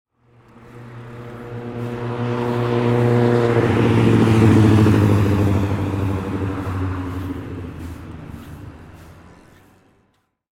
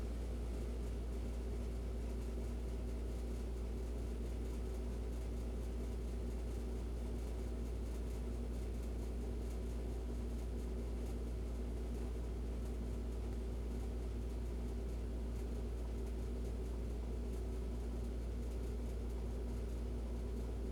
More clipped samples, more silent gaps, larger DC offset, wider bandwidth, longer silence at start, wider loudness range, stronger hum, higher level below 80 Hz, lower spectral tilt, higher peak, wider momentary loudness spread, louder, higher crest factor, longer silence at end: neither; neither; neither; about the same, 13 kHz vs 12.5 kHz; first, 0.7 s vs 0 s; first, 16 LU vs 0 LU; second, none vs 60 Hz at -55 dBFS; about the same, -40 dBFS vs -42 dBFS; about the same, -8 dB/octave vs -7.5 dB/octave; first, -2 dBFS vs -32 dBFS; first, 22 LU vs 0 LU; first, -18 LUFS vs -44 LUFS; first, 18 dB vs 10 dB; first, 1.45 s vs 0 s